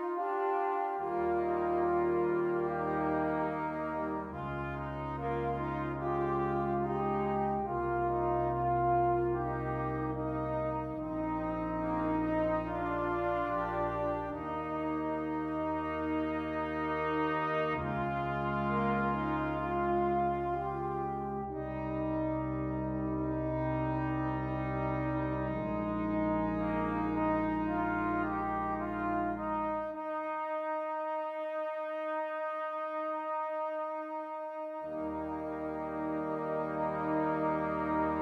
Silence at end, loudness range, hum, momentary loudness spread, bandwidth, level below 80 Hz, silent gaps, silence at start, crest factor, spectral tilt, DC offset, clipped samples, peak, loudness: 0 s; 4 LU; none; 6 LU; 6 kHz; -52 dBFS; none; 0 s; 14 dB; -9.5 dB/octave; under 0.1%; under 0.1%; -20 dBFS; -34 LUFS